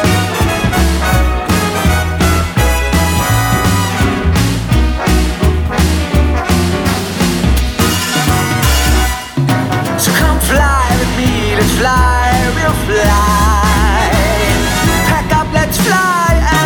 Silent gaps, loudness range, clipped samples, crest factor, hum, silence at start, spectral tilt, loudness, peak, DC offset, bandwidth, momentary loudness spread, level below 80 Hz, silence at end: none; 2 LU; under 0.1%; 12 dB; none; 0 s; -4.5 dB/octave; -12 LUFS; 0 dBFS; under 0.1%; 18 kHz; 3 LU; -16 dBFS; 0 s